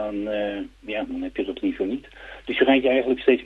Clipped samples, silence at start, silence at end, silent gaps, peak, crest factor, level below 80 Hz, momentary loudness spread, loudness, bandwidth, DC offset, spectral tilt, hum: under 0.1%; 0 s; 0 s; none; -6 dBFS; 18 dB; -52 dBFS; 15 LU; -24 LUFS; 4.9 kHz; under 0.1%; -6.5 dB/octave; none